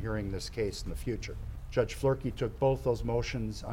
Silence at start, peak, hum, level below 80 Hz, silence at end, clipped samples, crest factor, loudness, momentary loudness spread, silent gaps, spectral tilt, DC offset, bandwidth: 0 s; -14 dBFS; none; -42 dBFS; 0 s; under 0.1%; 18 dB; -33 LUFS; 8 LU; none; -6 dB/octave; under 0.1%; 16 kHz